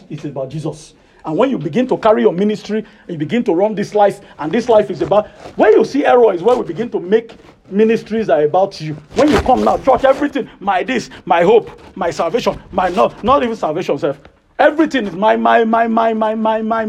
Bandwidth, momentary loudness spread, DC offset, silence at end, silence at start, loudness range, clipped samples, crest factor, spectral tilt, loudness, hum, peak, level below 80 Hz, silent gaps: 12 kHz; 11 LU; under 0.1%; 0 s; 0.1 s; 3 LU; under 0.1%; 14 dB; -6 dB/octave; -15 LUFS; none; 0 dBFS; -42 dBFS; none